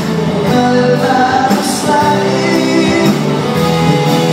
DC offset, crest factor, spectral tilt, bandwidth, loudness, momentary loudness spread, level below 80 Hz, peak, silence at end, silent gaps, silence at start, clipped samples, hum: under 0.1%; 10 dB; -5.5 dB/octave; 16 kHz; -11 LUFS; 3 LU; -46 dBFS; 0 dBFS; 0 s; none; 0 s; under 0.1%; none